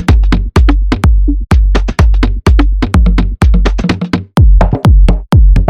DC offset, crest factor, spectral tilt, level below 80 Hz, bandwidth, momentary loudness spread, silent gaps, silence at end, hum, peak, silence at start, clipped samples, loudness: under 0.1%; 8 dB; -7.5 dB/octave; -8 dBFS; 9.8 kHz; 5 LU; none; 0 s; none; 0 dBFS; 0 s; under 0.1%; -11 LUFS